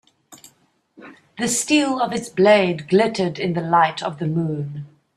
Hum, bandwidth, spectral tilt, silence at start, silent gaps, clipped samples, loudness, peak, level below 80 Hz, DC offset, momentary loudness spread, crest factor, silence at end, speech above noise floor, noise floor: none; 14 kHz; -4.5 dB/octave; 0.3 s; none; under 0.1%; -19 LUFS; -2 dBFS; -62 dBFS; under 0.1%; 11 LU; 18 dB; 0.3 s; 40 dB; -59 dBFS